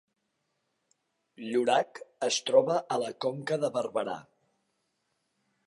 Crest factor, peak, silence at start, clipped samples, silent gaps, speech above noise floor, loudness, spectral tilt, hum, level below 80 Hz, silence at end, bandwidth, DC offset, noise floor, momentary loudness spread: 22 dB; -10 dBFS; 1.4 s; under 0.1%; none; 50 dB; -29 LUFS; -3.5 dB/octave; none; -84 dBFS; 1.45 s; 11.5 kHz; under 0.1%; -79 dBFS; 13 LU